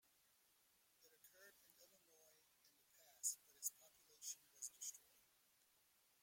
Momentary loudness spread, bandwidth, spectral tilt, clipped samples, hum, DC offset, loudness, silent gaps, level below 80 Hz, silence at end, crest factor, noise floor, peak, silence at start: 22 LU; 16.5 kHz; 2.5 dB/octave; under 0.1%; none; under 0.1%; -50 LUFS; none; under -90 dBFS; 1.05 s; 28 dB; -79 dBFS; -30 dBFS; 1 s